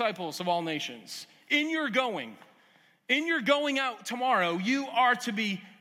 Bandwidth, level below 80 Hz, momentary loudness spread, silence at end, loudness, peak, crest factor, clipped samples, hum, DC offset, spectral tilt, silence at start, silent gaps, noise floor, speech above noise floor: 16 kHz; under -90 dBFS; 12 LU; 0.1 s; -28 LUFS; -12 dBFS; 18 dB; under 0.1%; none; under 0.1%; -3.5 dB/octave; 0 s; none; -63 dBFS; 34 dB